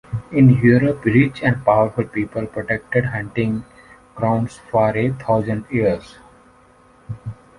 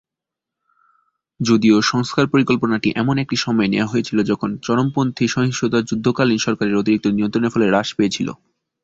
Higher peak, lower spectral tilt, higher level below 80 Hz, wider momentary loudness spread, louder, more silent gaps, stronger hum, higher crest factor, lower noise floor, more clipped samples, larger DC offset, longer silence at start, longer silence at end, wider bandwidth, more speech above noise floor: about the same, -2 dBFS vs -2 dBFS; first, -9 dB/octave vs -5.5 dB/octave; first, -46 dBFS vs -54 dBFS; first, 12 LU vs 4 LU; about the same, -18 LUFS vs -18 LUFS; neither; neither; about the same, 16 dB vs 16 dB; second, -51 dBFS vs -85 dBFS; neither; neither; second, 0.1 s vs 1.4 s; second, 0.25 s vs 0.5 s; first, 11 kHz vs 7.8 kHz; second, 33 dB vs 68 dB